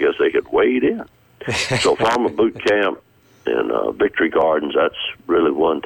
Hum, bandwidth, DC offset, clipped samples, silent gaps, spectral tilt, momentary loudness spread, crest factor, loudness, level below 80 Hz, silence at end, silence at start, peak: none; 17 kHz; under 0.1%; under 0.1%; none; -4.5 dB/octave; 7 LU; 12 dB; -18 LUFS; -50 dBFS; 0.05 s; 0 s; -6 dBFS